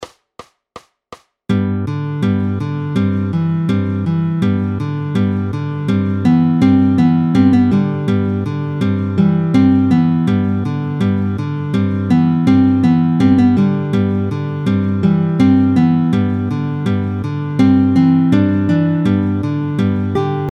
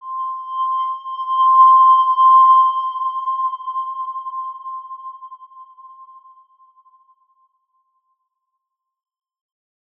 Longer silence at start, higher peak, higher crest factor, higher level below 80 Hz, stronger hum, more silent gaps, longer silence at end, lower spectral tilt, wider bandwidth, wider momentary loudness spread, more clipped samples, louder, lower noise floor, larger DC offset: about the same, 0 s vs 0.05 s; first, 0 dBFS vs -4 dBFS; about the same, 14 dB vs 16 dB; first, -48 dBFS vs under -90 dBFS; neither; neither; second, 0 s vs 3.95 s; first, -9 dB/octave vs 0.5 dB/octave; first, 7.2 kHz vs 3.4 kHz; second, 8 LU vs 21 LU; neither; about the same, -15 LUFS vs -15 LUFS; second, -41 dBFS vs -78 dBFS; neither